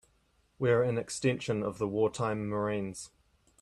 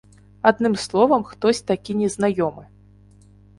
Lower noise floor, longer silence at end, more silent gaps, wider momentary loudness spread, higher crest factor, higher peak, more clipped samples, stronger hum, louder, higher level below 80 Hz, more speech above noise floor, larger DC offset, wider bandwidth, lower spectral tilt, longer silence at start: first, -70 dBFS vs -50 dBFS; second, 0.55 s vs 0.95 s; neither; first, 10 LU vs 6 LU; about the same, 18 dB vs 20 dB; second, -16 dBFS vs 0 dBFS; neither; second, none vs 50 Hz at -40 dBFS; second, -31 LUFS vs -20 LUFS; second, -64 dBFS vs -54 dBFS; first, 40 dB vs 30 dB; neither; about the same, 12.5 kHz vs 11.5 kHz; about the same, -6 dB/octave vs -5 dB/octave; first, 0.6 s vs 0.45 s